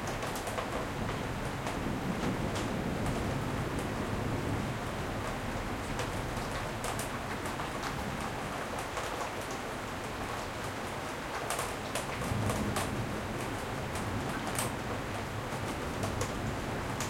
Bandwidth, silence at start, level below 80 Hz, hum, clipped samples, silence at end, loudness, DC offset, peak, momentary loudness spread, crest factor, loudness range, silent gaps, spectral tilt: 16.5 kHz; 0 s; -48 dBFS; none; under 0.1%; 0 s; -35 LUFS; under 0.1%; -16 dBFS; 4 LU; 20 dB; 2 LU; none; -4.5 dB/octave